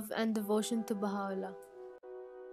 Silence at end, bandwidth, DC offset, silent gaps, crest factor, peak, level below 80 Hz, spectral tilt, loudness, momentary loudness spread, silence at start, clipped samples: 0 s; 15.5 kHz; under 0.1%; none; 16 dB; -22 dBFS; -80 dBFS; -5 dB/octave; -36 LUFS; 17 LU; 0 s; under 0.1%